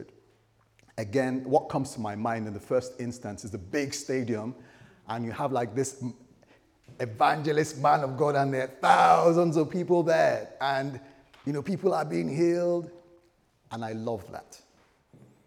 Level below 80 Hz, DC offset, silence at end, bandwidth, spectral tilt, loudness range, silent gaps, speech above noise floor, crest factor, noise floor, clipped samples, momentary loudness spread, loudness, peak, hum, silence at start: -70 dBFS; under 0.1%; 0.9 s; 16 kHz; -6 dB/octave; 9 LU; none; 38 dB; 22 dB; -65 dBFS; under 0.1%; 16 LU; -27 LUFS; -8 dBFS; none; 0 s